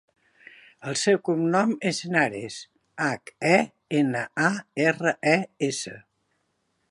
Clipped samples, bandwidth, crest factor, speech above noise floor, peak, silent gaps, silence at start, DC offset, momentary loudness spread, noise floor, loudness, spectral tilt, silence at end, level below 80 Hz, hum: under 0.1%; 11.5 kHz; 22 dB; 49 dB; -4 dBFS; none; 0.8 s; under 0.1%; 13 LU; -73 dBFS; -24 LUFS; -4.5 dB/octave; 0.9 s; -72 dBFS; none